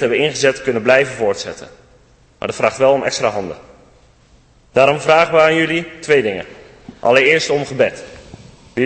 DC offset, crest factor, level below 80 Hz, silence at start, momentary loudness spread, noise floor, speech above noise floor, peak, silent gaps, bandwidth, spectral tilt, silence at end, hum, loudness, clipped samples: under 0.1%; 16 dB; -50 dBFS; 0 s; 16 LU; -50 dBFS; 35 dB; 0 dBFS; none; 8.8 kHz; -4 dB/octave; 0 s; none; -15 LUFS; under 0.1%